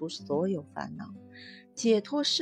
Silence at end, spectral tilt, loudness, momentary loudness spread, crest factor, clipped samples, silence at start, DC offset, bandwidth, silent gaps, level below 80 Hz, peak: 0 s; -4 dB/octave; -30 LUFS; 21 LU; 18 dB; under 0.1%; 0 s; under 0.1%; 11 kHz; none; -74 dBFS; -14 dBFS